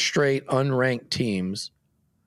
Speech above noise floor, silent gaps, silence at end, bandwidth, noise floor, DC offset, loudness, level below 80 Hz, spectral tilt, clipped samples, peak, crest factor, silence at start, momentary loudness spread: 45 dB; none; 0.6 s; 13.5 kHz; -69 dBFS; under 0.1%; -25 LUFS; -62 dBFS; -5 dB/octave; under 0.1%; -10 dBFS; 16 dB; 0 s; 10 LU